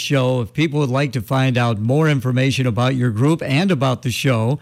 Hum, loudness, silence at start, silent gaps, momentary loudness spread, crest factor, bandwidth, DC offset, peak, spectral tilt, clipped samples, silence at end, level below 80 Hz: none; -18 LUFS; 0 s; none; 3 LU; 10 dB; 14.5 kHz; under 0.1%; -6 dBFS; -6.5 dB/octave; under 0.1%; 0.05 s; -54 dBFS